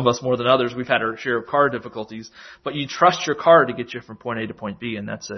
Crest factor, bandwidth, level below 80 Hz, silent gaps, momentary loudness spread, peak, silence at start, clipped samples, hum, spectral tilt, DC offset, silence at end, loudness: 20 dB; 6.4 kHz; -60 dBFS; none; 18 LU; -2 dBFS; 0 s; under 0.1%; none; -5 dB/octave; under 0.1%; 0 s; -20 LUFS